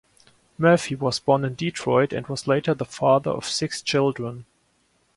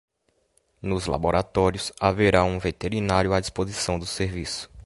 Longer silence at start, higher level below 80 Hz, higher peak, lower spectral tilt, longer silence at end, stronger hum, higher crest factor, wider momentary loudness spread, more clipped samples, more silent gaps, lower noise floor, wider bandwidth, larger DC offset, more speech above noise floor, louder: second, 0.6 s vs 0.85 s; second, -58 dBFS vs -40 dBFS; about the same, -4 dBFS vs -2 dBFS; about the same, -5 dB/octave vs -5 dB/octave; first, 0.75 s vs 0.05 s; neither; about the same, 18 dB vs 22 dB; about the same, 8 LU vs 9 LU; neither; neither; about the same, -66 dBFS vs -68 dBFS; about the same, 11.5 kHz vs 11.5 kHz; neither; about the same, 43 dB vs 44 dB; about the same, -23 LUFS vs -24 LUFS